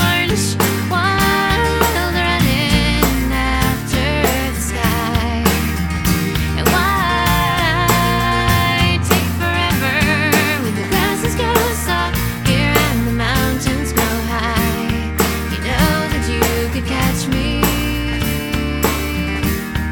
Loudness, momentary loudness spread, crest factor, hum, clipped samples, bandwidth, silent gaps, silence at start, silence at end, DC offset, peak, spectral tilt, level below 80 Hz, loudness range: -16 LUFS; 5 LU; 16 dB; none; under 0.1%; over 20 kHz; none; 0 s; 0 s; under 0.1%; 0 dBFS; -4.5 dB/octave; -24 dBFS; 3 LU